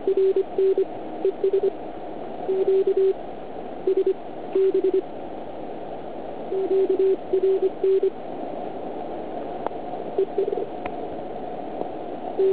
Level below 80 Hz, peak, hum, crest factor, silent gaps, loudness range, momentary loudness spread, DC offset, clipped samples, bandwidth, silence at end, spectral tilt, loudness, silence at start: -58 dBFS; -8 dBFS; none; 16 dB; none; 6 LU; 14 LU; 1%; under 0.1%; 4 kHz; 0 s; -10.5 dB/octave; -25 LUFS; 0 s